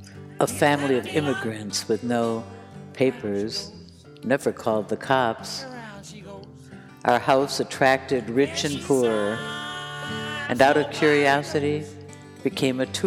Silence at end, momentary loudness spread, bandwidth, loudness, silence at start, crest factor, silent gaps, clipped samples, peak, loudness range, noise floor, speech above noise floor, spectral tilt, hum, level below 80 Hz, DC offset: 0 s; 20 LU; 16.5 kHz; -24 LUFS; 0 s; 22 dB; none; under 0.1%; -2 dBFS; 5 LU; -44 dBFS; 21 dB; -4.5 dB/octave; none; -60 dBFS; under 0.1%